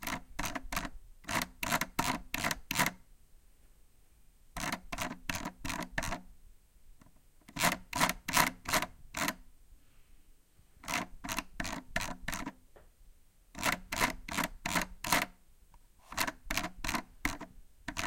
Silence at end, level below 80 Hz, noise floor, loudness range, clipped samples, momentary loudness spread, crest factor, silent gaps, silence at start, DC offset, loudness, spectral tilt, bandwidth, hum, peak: 0 s; -50 dBFS; -61 dBFS; 7 LU; under 0.1%; 11 LU; 30 dB; none; 0 s; under 0.1%; -35 LUFS; -2.5 dB/octave; 17 kHz; none; -8 dBFS